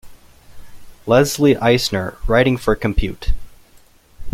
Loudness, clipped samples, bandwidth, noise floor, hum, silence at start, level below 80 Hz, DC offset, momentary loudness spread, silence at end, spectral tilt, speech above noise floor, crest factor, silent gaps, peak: -17 LUFS; under 0.1%; 16.5 kHz; -49 dBFS; none; 0.05 s; -28 dBFS; under 0.1%; 14 LU; 0.05 s; -5.5 dB/octave; 33 dB; 18 dB; none; 0 dBFS